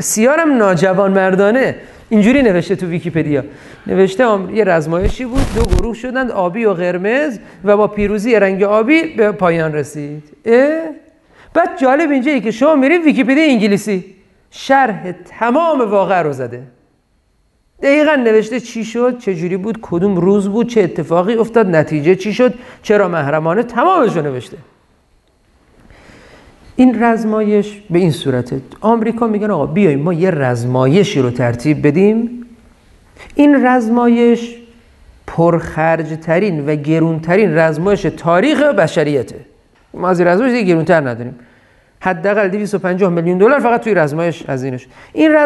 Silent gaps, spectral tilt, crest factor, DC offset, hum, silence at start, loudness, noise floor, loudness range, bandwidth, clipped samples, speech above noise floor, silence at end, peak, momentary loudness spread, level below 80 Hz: none; -6.5 dB/octave; 14 dB; under 0.1%; none; 0 s; -13 LUFS; -58 dBFS; 3 LU; 12.5 kHz; under 0.1%; 45 dB; 0 s; 0 dBFS; 10 LU; -34 dBFS